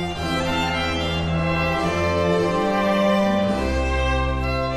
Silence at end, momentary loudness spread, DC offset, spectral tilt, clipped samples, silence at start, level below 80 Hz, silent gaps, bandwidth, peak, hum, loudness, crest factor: 0 s; 4 LU; under 0.1%; -6 dB/octave; under 0.1%; 0 s; -30 dBFS; none; 15 kHz; -6 dBFS; none; -21 LUFS; 14 dB